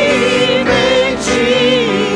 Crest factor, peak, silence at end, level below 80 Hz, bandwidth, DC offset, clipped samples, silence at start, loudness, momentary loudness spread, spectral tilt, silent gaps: 10 dB; -2 dBFS; 0 s; -38 dBFS; 10.5 kHz; under 0.1%; under 0.1%; 0 s; -12 LUFS; 2 LU; -3.5 dB/octave; none